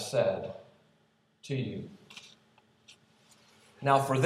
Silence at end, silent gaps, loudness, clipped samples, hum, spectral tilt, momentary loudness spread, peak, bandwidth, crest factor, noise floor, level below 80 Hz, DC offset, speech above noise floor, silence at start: 0 s; none; -32 LUFS; under 0.1%; none; -5.5 dB/octave; 23 LU; -10 dBFS; 15 kHz; 22 dB; -69 dBFS; -78 dBFS; under 0.1%; 40 dB; 0 s